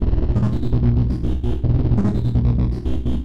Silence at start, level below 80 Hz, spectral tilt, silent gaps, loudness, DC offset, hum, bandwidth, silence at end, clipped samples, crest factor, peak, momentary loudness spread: 0 s; -22 dBFS; -10 dB/octave; none; -20 LUFS; 4%; none; 5.4 kHz; 0 s; under 0.1%; 12 dB; -6 dBFS; 5 LU